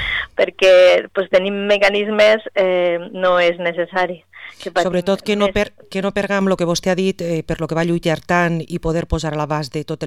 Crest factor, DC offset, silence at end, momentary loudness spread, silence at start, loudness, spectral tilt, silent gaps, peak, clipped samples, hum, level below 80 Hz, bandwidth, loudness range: 14 dB; 0.3%; 0 s; 9 LU; 0 s; -17 LUFS; -5 dB/octave; none; -2 dBFS; under 0.1%; none; -40 dBFS; 14 kHz; 5 LU